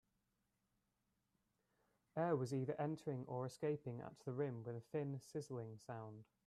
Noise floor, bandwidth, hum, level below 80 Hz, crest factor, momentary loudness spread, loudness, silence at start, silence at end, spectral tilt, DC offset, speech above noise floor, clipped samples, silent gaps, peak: -87 dBFS; 13 kHz; none; -84 dBFS; 18 dB; 10 LU; -46 LUFS; 2.15 s; 0.25 s; -7.5 dB/octave; under 0.1%; 42 dB; under 0.1%; none; -28 dBFS